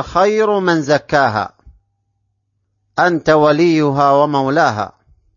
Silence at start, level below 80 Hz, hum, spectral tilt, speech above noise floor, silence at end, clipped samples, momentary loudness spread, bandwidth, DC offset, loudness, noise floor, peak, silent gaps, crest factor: 0 s; -48 dBFS; none; -6 dB/octave; 54 dB; 0.5 s; under 0.1%; 11 LU; 7.4 kHz; under 0.1%; -14 LUFS; -68 dBFS; 0 dBFS; none; 16 dB